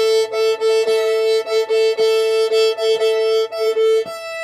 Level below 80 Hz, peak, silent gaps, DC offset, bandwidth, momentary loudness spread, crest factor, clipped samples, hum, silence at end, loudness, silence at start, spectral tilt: -70 dBFS; -6 dBFS; none; under 0.1%; 15 kHz; 3 LU; 10 dB; under 0.1%; none; 0 s; -17 LUFS; 0 s; -0.5 dB/octave